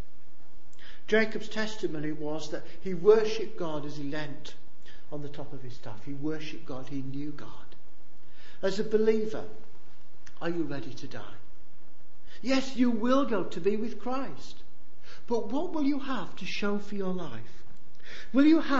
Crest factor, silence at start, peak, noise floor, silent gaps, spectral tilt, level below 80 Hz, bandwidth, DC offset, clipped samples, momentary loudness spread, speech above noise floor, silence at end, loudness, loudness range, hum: 22 dB; 0.55 s; -8 dBFS; -61 dBFS; none; -6 dB/octave; -60 dBFS; 8 kHz; 5%; under 0.1%; 20 LU; 31 dB; 0 s; -31 LUFS; 11 LU; none